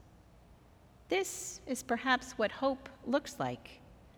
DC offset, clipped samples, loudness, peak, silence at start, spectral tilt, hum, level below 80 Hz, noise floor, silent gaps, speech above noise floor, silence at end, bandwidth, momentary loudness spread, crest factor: under 0.1%; under 0.1%; -35 LUFS; -14 dBFS; 0.5 s; -3 dB/octave; none; -64 dBFS; -60 dBFS; none; 25 dB; 0.1 s; over 20 kHz; 10 LU; 24 dB